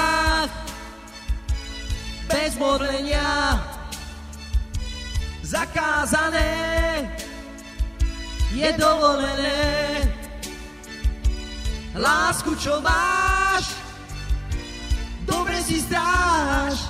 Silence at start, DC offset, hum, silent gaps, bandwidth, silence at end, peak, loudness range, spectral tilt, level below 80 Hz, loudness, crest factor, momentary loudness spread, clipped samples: 0 s; under 0.1%; none; none; 15.5 kHz; 0 s; -4 dBFS; 3 LU; -4 dB/octave; -30 dBFS; -23 LUFS; 18 dB; 15 LU; under 0.1%